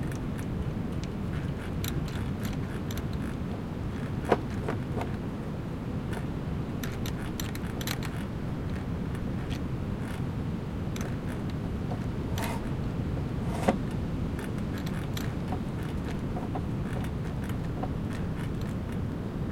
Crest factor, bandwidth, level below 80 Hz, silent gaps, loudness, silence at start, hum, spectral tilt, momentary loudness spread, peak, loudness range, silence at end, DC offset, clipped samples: 24 dB; 17 kHz; -42 dBFS; none; -33 LUFS; 0 s; none; -6.5 dB/octave; 2 LU; -8 dBFS; 2 LU; 0 s; under 0.1%; under 0.1%